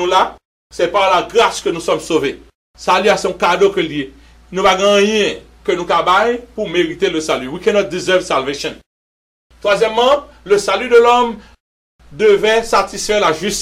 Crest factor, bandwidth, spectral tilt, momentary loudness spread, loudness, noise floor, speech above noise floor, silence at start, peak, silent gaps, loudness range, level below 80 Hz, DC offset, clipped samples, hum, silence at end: 14 dB; 15.5 kHz; -3.5 dB/octave; 10 LU; -14 LUFS; under -90 dBFS; over 76 dB; 0 s; -2 dBFS; 0.45-0.70 s, 2.55-2.74 s, 8.86-9.50 s, 11.60-11.99 s; 3 LU; -44 dBFS; under 0.1%; under 0.1%; none; 0 s